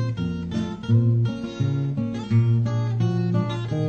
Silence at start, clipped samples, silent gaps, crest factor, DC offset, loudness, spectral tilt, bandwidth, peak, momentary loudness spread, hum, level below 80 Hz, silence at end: 0 s; under 0.1%; none; 14 dB; under 0.1%; -23 LUFS; -8.5 dB/octave; 7 kHz; -10 dBFS; 8 LU; none; -50 dBFS; 0 s